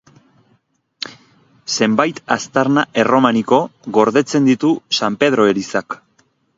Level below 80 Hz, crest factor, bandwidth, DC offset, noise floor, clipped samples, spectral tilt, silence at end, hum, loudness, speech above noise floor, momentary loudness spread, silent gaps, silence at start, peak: -62 dBFS; 16 dB; 7.8 kHz; under 0.1%; -61 dBFS; under 0.1%; -4.5 dB/octave; 0.6 s; none; -16 LUFS; 46 dB; 16 LU; none; 1.05 s; 0 dBFS